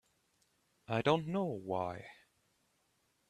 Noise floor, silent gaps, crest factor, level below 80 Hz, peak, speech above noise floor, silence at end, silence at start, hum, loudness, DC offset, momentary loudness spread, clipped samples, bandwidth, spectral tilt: -77 dBFS; none; 24 dB; -74 dBFS; -16 dBFS; 42 dB; 1.15 s; 0.9 s; none; -36 LUFS; under 0.1%; 15 LU; under 0.1%; 13 kHz; -7 dB/octave